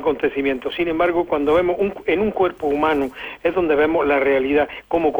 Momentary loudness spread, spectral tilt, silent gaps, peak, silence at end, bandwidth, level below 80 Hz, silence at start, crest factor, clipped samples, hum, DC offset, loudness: 5 LU; -7 dB/octave; none; -6 dBFS; 0 s; over 20 kHz; -46 dBFS; 0 s; 12 dB; under 0.1%; none; under 0.1%; -19 LUFS